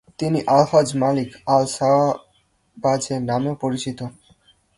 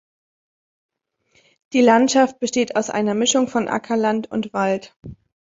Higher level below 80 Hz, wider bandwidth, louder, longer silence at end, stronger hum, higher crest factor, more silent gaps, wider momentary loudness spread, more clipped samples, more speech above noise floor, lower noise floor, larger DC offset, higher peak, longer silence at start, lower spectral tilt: about the same, -56 dBFS vs -60 dBFS; first, 11.5 kHz vs 7.8 kHz; about the same, -20 LUFS vs -19 LUFS; first, 0.65 s vs 0.45 s; neither; about the same, 18 dB vs 18 dB; second, none vs 4.96-5.00 s; about the same, 11 LU vs 9 LU; neither; about the same, 43 dB vs 44 dB; about the same, -63 dBFS vs -63 dBFS; neither; about the same, -4 dBFS vs -2 dBFS; second, 0.2 s vs 1.7 s; first, -6 dB/octave vs -3.5 dB/octave